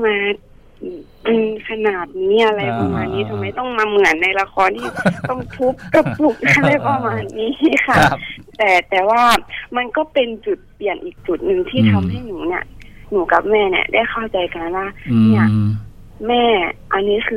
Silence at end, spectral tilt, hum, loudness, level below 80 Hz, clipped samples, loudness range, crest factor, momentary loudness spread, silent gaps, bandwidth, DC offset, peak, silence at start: 0 s; -6 dB/octave; none; -17 LUFS; -42 dBFS; under 0.1%; 4 LU; 16 dB; 11 LU; none; 16 kHz; under 0.1%; 0 dBFS; 0 s